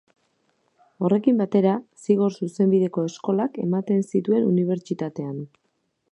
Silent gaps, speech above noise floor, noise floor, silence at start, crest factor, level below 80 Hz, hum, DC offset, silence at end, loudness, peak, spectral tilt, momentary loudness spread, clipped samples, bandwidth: none; 50 dB; -72 dBFS; 1 s; 18 dB; -72 dBFS; none; under 0.1%; 0.65 s; -23 LUFS; -6 dBFS; -8.5 dB/octave; 10 LU; under 0.1%; 10.5 kHz